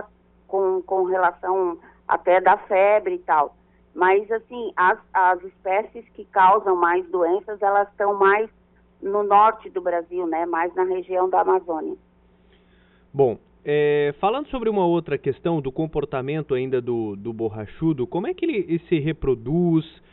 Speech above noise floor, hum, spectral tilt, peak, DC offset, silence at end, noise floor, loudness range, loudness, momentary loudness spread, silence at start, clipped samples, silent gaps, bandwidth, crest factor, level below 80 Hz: 35 dB; none; -5.5 dB/octave; -6 dBFS; under 0.1%; 0.25 s; -56 dBFS; 4 LU; -22 LUFS; 11 LU; 0 s; under 0.1%; none; 4.1 kHz; 16 dB; -52 dBFS